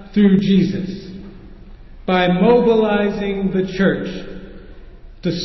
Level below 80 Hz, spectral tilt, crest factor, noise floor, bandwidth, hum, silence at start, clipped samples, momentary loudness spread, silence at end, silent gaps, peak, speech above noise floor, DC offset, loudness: -40 dBFS; -8 dB/octave; 14 dB; -38 dBFS; 6 kHz; none; 0 s; under 0.1%; 19 LU; 0 s; none; -4 dBFS; 22 dB; under 0.1%; -17 LUFS